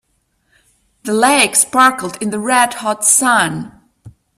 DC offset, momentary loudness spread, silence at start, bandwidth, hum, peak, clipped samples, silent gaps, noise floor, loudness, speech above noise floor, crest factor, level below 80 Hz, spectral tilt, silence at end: under 0.1%; 12 LU; 1.05 s; over 20 kHz; none; 0 dBFS; under 0.1%; none; -64 dBFS; -13 LUFS; 50 dB; 16 dB; -56 dBFS; -2 dB/octave; 0.3 s